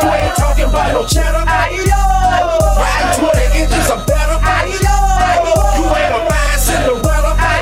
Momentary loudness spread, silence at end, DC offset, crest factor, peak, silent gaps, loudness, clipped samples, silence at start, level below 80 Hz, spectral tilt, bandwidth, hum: 2 LU; 0 s; under 0.1%; 8 dB; -2 dBFS; none; -13 LUFS; under 0.1%; 0 s; -16 dBFS; -4.5 dB/octave; 16 kHz; none